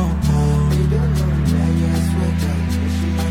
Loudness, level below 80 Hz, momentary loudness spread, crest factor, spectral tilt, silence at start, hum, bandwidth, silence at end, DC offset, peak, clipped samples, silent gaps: -18 LUFS; -24 dBFS; 4 LU; 10 dB; -7 dB/octave; 0 s; none; 16 kHz; 0 s; under 0.1%; -6 dBFS; under 0.1%; none